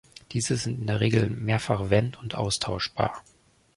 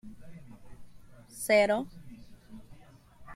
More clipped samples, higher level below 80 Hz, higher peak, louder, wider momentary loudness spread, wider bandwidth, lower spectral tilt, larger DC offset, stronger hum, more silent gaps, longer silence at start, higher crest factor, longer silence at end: neither; first, -48 dBFS vs -58 dBFS; first, -8 dBFS vs -12 dBFS; about the same, -27 LUFS vs -27 LUFS; second, 7 LU vs 28 LU; second, 11.5 kHz vs 16 kHz; about the same, -5 dB/octave vs -4 dB/octave; neither; neither; neither; first, 0.3 s vs 0.05 s; about the same, 20 dB vs 22 dB; first, 0.55 s vs 0 s